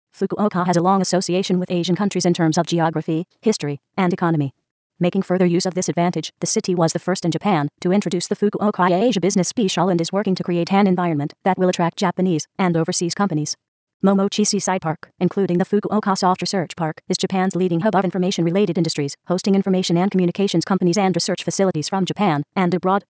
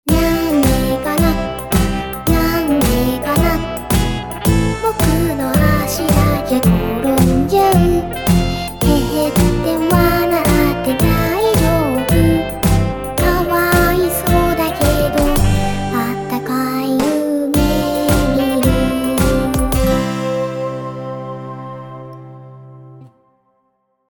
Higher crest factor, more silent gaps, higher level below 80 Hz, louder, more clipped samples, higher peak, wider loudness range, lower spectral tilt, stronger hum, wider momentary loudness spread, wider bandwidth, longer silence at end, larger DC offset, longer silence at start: about the same, 16 dB vs 14 dB; first, 4.71-4.90 s, 13.68-13.87 s, 13.94-14.00 s vs none; second, -66 dBFS vs -24 dBFS; second, -20 LUFS vs -15 LUFS; neither; second, -4 dBFS vs 0 dBFS; second, 2 LU vs 5 LU; about the same, -5.5 dB/octave vs -6 dB/octave; neither; about the same, 5 LU vs 7 LU; second, 8 kHz vs 19.5 kHz; second, 0.1 s vs 1.05 s; second, under 0.1% vs 0.4%; first, 0.2 s vs 0.05 s